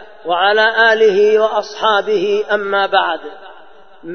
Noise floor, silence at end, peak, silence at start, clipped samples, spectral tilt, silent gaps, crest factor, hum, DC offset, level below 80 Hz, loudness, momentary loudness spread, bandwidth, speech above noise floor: -43 dBFS; 0 s; 0 dBFS; 0 s; under 0.1%; -3.5 dB/octave; none; 14 dB; none; 0.8%; -60 dBFS; -13 LUFS; 9 LU; 6.6 kHz; 30 dB